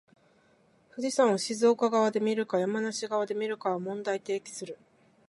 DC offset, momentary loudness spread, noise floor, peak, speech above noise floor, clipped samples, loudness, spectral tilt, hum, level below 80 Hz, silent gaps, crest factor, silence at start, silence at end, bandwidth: under 0.1%; 15 LU; -65 dBFS; -10 dBFS; 36 dB; under 0.1%; -29 LUFS; -4.5 dB/octave; none; -82 dBFS; none; 18 dB; 0.95 s; 0.55 s; 11.5 kHz